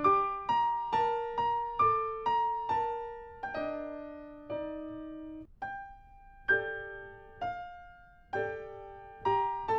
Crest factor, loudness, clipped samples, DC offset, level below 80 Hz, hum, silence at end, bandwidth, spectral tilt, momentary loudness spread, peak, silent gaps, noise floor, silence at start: 18 dB; -33 LUFS; under 0.1%; under 0.1%; -58 dBFS; none; 0 s; 7.2 kHz; -6 dB/octave; 17 LU; -16 dBFS; none; -55 dBFS; 0 s